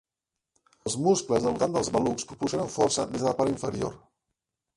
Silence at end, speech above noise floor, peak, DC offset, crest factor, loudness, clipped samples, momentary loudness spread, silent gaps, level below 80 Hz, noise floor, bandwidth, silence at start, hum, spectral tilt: 0.8 s; 61 dB; -10 dBFS; under 0.1%; 18 dB; -27 LUFS; under 0.1%; 8 LU; none; -56 dBFS; -87 dBFS; 11.5 kHz; 0.85 s; none; -4.5 dB/octave